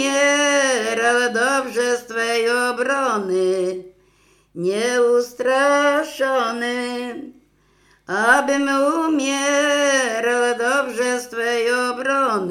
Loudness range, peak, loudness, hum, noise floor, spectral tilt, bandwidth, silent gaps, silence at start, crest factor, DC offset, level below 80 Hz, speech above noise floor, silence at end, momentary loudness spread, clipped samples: 3 LU; 0 dBFS; -19 LUFS; 50 Hz at -65 dBFS; -58 dBFS; -2 dB/octave; 16 kHz; none; 0 s; 18 dB; under 0.1%; -66 dBFS; 39 dB; 0 s; 7 LU; under 0.1%